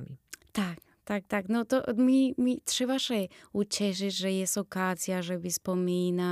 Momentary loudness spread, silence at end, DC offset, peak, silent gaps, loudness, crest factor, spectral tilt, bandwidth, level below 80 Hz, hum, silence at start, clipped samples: 10 LU; 0 s; under 0.1%; -14 dBFS; none; -30 LUFS; 16 dB; -4.5 dB/octave; 16 kHz; -68 dBFS; none; 0 s; under 0.1%